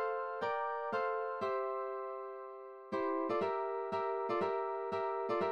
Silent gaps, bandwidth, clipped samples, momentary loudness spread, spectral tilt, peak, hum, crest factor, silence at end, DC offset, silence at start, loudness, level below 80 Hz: none; 7.8 kHz; under 0.1%; 8 LU; -6.5 dB/octave; -24 dBFS; none; 12 dB; 0 s; under 0.1%; 0 s; -37 LUFS; -80 dBFS